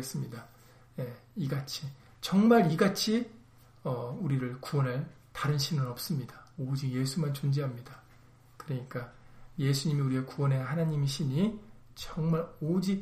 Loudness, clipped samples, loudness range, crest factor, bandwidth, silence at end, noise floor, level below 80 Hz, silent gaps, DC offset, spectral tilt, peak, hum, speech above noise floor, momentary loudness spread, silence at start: -31 LUFS; under 0.1%; 5 LU; 22 dB; 15.5 kHz; 0 s; -57 dBFS; -60 dBFS; none; under 0.1%; -6 dB/octave; -10 dBFS; none; 27 dB; 16 LU; 0 s